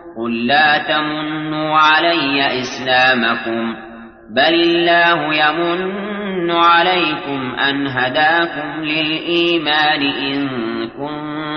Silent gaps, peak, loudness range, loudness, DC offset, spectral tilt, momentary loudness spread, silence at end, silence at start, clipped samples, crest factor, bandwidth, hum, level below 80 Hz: none; -2 dBFS; 2 LU; -15 LUFS; under 0.1%; -5 dB/octave; 11 LU; 0 s; 0 s; under 0.1%; 14 dB; 6.6 kHz; none; -54 dBFS